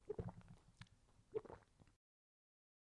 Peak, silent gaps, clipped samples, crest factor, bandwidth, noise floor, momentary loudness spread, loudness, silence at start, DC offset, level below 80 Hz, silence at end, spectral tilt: -34 dBFS; none; under 0.1%; 24 dB; 10.5 kHz; -72 dBFS; 14 LU; -54 LUFS; 0 s; under 0.1%; -70 dBFS; 1.05 s; -7.5 dB/octave